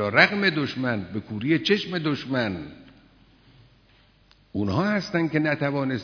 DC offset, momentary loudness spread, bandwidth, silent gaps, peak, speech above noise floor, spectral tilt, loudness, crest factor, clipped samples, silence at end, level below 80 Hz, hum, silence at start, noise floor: under 0.1%; 11 LU; 5.4 kHz; none; -2 dBFS; 34 dB; -6.5 dB/octave; -24 LUFS; 24 dB; under 0.1%; 0 s; -60 dBFS; none; 0 s; -58 dBFS